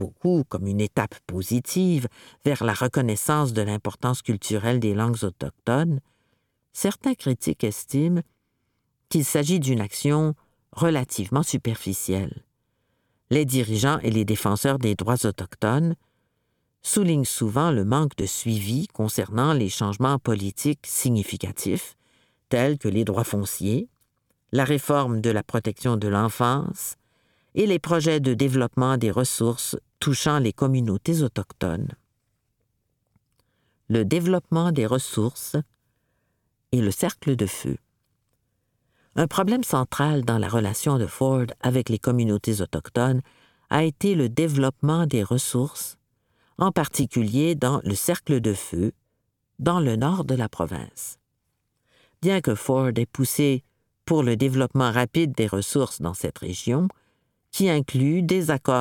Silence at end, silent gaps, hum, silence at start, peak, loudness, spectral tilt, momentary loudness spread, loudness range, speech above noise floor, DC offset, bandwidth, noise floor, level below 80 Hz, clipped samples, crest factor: 0 s; none; none; 0 s; -4 dBFS; -24 LUFS; -5.5 dB/octave; 7 LU; 3 LU; 52 dB; under 0.1%; 19 kHz; -75 dBFS; -54 dBFS; under 0.1%; 20 dB